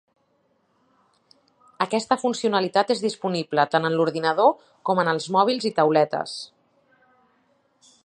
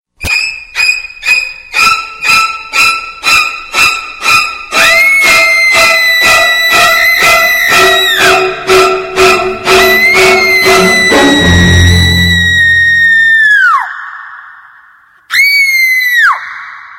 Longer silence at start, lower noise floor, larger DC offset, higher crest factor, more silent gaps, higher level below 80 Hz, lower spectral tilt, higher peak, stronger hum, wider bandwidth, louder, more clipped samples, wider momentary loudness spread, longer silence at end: first, 1.8 s vs 0.2 s; first, -67 dBFS vs -42 dBFS; neither; first, 20 dB vs 8 dB; neither; second, -74 dBFS vs -30 dBFS; first, -5 dB/octave vs -3 dB/octave; second, -4 dBFS vs 0 dBFS; neither; second, 10.5 kHz vs 17 kHz; second, -22 LUFS vs -6 LUFS; second, under 0.1% vs 0.2%; about the same, 9 LU vs 8 LU; first, 1.6 s vs 0 s